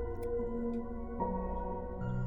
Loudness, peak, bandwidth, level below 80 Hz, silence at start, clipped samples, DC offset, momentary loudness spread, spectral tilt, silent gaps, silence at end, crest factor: -38 LUFS; -22 dBFS; 9.8 kHz; -44 dBFS; 0 s; under 0.1%; under 0.1%; 4 LU; -10.5 dB/octave; none; 0 s; 14 dB